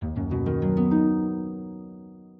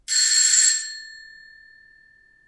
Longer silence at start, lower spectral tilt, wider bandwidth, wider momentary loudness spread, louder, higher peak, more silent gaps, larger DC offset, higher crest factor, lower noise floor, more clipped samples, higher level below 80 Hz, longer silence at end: about the same, 0 s vs 0.1 s; first, -12.5 dB/octave vs 7 dB/octave; second, 3.5 kHz vs 11.5 kHz; about the same, 20 LU vs 22 LU; second, -25 LUFS vs -16 LUFS; second, -10 dBFS vs -4 dBFS; neither; neither; about the same, 14 dB vs 18 dB; second, -45 dBFS vs -55 dBFS; neither; first, -44 dBFS vs -68 dBFS; second, 0.1 s vs 1.3 s